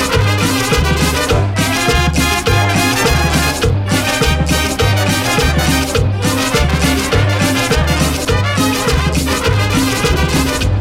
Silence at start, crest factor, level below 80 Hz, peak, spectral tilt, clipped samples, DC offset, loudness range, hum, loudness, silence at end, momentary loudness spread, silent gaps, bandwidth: 0 s; 12 dB; -22 dBFS; -2 dBFS; -4.5 dB/octave; under 0.1%; under 0.1%; 1 LU; none; -13 LUFS; 0 s; 2 LU; none; 16.5 kHz